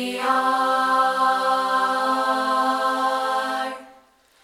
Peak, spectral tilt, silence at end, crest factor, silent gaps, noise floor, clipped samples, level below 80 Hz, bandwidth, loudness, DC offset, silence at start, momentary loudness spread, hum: -8 dBFS; -2 dB/octave; 0.55 s; 14 dB; none; -55 dBFS; under 0.1%; -72 dBFS; 16.5 kHz; -21 LUFS; under 0.1%; 0 s; 5 LU; none